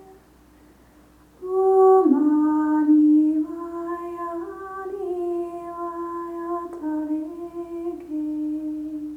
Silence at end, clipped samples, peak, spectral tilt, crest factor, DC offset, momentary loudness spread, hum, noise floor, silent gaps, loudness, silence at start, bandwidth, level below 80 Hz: 0 s; under 0.1%; -6 dBFS; -8 dB/octave; 16 dB; under 0.1%; 16 LU; none; -53 dBFS; none; -23 LUFS; 0 s; 2.9 kHz; -60 dBFS